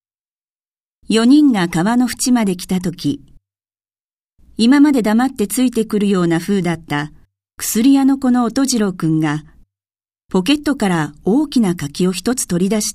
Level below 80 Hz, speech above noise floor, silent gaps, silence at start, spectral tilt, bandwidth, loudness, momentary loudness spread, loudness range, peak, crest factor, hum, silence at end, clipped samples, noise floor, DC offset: -48 dBFS; over 75 dB; 4.00-4.25 s, 10.25-10.29 s; 1.1 s; -5 dB/octave; 15.5 kHz; -16 LUFS; 10 LU; 2 LU; -2 dBFS; 16 dB; none; 0 s; under 0.1%; under -90 dBFS; under 0.1%